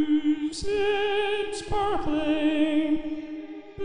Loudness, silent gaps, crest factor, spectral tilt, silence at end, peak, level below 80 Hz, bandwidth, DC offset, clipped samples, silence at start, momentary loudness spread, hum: -26 LUFS; none; 14 dB; -5 dB/octave; 0 s; -12 dBFS; -44 dBFS; 10.5 kHz; 1%; under 0.1%; 0 s; 11 LU; none